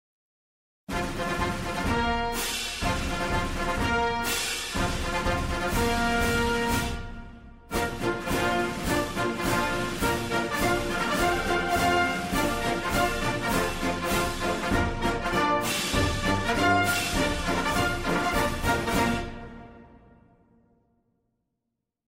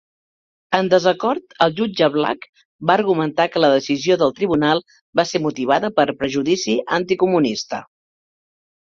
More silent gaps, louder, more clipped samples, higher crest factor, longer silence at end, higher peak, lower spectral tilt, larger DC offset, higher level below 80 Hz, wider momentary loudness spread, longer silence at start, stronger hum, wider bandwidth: second, none vs 2.49-2.53 s, 2.65-2.79 s, 5.01-5.13 s; second, -26 LUFS vs -18 LUFS; neither; about the same, 16 dB vs 18 dB; first, 2.2 s vs 1 s; second, -10 dBFS vs 0 dBFS; about the same, -4 dB/octave vs -5 dB/octave; neither; first, -38 dBFS vs -58 dBFS; about the same, 5 LU vs 6 LU; first, 0.9 s vs 0.7 s; neither; first, 16 kHz vs 7.6 kHz